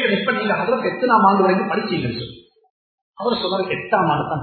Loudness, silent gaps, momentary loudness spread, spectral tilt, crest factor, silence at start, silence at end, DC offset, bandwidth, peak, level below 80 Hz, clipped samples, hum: -19 LUFS; 2.70-3.13 s; 11 LU; -9.5 dB/octave; 18 dB; 0 s; 0 s; under 0.1%; 4.6 kHz; -2 dBFS; -56 dBFS; under 0.1%; none